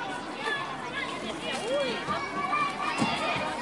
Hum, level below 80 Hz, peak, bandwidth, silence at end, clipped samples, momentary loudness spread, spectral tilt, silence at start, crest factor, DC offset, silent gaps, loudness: none; -62 dBFS; -14 dBFS; 11.5 kHz; 0 s; under 0.1%; 6 LU; -3.5 dB/octave; 0 s; 16 dB; under 0.1%; none; -30 LUFS